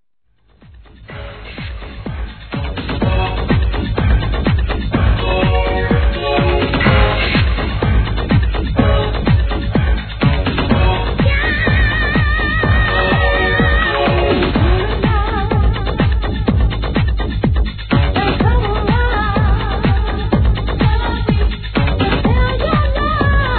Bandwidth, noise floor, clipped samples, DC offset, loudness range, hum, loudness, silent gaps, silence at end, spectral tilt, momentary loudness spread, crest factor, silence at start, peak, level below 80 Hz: 4.5 kHz; -60 dBFS; under 0.1%; under 0.1%; 4 LU; none; -15 LUFS; none; 0 s; -10 dB/octave; 5 LU; 14 dB; 0.75 s; 0 dBFS; -18 dBFS